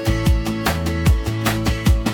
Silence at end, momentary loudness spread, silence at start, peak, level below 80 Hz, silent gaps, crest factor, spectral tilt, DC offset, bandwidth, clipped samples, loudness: 0 s; 2 LU; 0 s; -4 dBFS; -22 dBFS; none; 14 dB; -5.5 dB/octave; under 0.1%; 18 kHz; under 0.1%; -20 LUFS